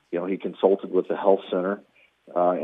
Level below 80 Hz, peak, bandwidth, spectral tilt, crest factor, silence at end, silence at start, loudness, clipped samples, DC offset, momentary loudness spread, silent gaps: -86 dBFS; -6 dBFS; 3.9 kHz; -9 dB/octave; 20 dB; 0 s; 0.1 s; -25 LUFS; under 0.1%; under 0.1%; 8 LU; none